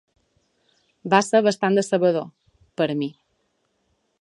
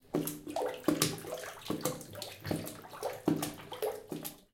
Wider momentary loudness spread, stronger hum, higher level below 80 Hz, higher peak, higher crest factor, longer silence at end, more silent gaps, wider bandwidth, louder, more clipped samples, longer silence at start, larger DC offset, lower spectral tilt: first, 19 LU vs 10 LU; neither; about the same, -70 dBFS vs -66 dBFS; first, 0 dBFS vs -8 dBFS; second, 22 dB vs 28 dB; first, 1.1 s vs 0.15 s; neither; second, 11.5 kHz vs 17 kHz; first, -21 LUFS vs -37 LUFS; neither; first, 1.05 s vs 0.05 s; neither; about the same, -5 dB/octave vs -4 dB/octave